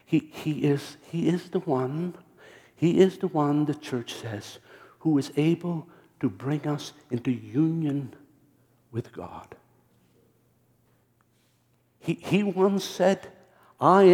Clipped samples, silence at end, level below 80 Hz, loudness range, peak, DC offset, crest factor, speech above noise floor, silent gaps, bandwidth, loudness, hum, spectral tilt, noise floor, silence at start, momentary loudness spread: under 0.1%; 0 s; -70 dBFS; 17 LU; -6 dBFS; under 0.1%; 22 dB; 42 dB; none; 16 kHz; -27 LUFS; none; -7 dB/octave; -67 dBFS; 0.1 s; 14 LU